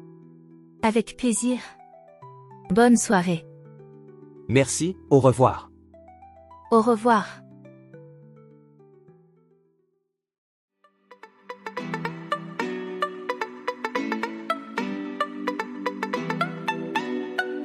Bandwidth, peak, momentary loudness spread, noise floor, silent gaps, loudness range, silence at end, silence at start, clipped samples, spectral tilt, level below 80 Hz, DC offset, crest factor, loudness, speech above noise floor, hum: 14 kHz; -6 dBFS; 13 LU; -75 dBFS; 10.38-10.68 s; 12 LU; 0 s; 0 s; under 0.1%; -5 dB/octave; -62 dBFS; under 0.1%; 20 dB; -25 LUFS; 55 dB; none